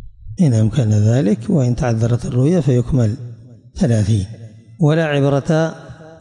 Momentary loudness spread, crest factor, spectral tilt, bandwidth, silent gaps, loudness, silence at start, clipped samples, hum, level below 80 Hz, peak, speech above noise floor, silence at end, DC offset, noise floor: 12 LU; 12 dB; -7.5 dB/octave; 10.5 kHz; none; -16 LUFS; 0 s; under 0.1%; none; -38 dBFS; -6 dBFS; 22 dB; 0.05 s; under 0.1%; -37 dBFS